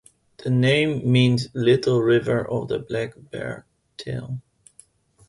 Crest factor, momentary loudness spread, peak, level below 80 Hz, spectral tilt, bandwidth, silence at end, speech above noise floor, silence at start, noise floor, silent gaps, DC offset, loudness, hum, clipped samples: 18 dB; 15 LU; -6 dBFS; -56 dBFS; -7 dB/octave; 11.5 kHz; 0.9 s; 34 dB; 0.45 s; -55 dBFS; none; under 0.1%; -22 LUFS; none; under 0.1%